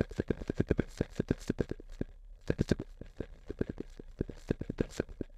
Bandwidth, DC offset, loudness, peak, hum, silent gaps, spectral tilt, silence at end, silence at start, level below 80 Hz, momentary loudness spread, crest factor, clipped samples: 14 kHz; under 0.1%; -37 LUFS; -12 dBFS; none; none; -7.5 dB/octave; 0 s; 0 s; -46 dBFS; 14 LU; 24 dB; under 0.1%